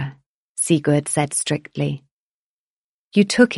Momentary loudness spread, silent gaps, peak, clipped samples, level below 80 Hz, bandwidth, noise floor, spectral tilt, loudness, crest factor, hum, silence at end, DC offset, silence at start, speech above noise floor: 13 LU; 0.26-0.55 s, 2.11-3.11 s; -2 dBFS; under 0.1%; -60 dBFS; 11.5 kHz; under -90 dBFS; -4.5 dB/octave; -20 LUFS; 20 dB; none; 0 s; under 0.1%; 0 s; over 72 dB